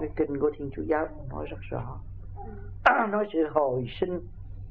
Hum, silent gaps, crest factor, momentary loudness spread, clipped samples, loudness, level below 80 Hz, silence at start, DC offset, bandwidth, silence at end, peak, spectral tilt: none; none; 26 dB; 19 LU; under 0.1%; -28 LUFS; -44 dBFS; 0 s; 0.4%; 6.8 kHz; 0 s; -4 dBFS; -8.5 dB/octave